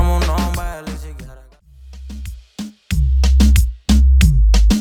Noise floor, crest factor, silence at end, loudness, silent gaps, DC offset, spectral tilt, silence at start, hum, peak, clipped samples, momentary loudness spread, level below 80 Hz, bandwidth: -42 dBFS; 14 dB; 0 s; -15 LUFS; none; under 0.1%; -6 dB/octave; 0 s; none; 0 dBFS; under 0.1%; 20 LU; -16 dBFS; 15.5 kHz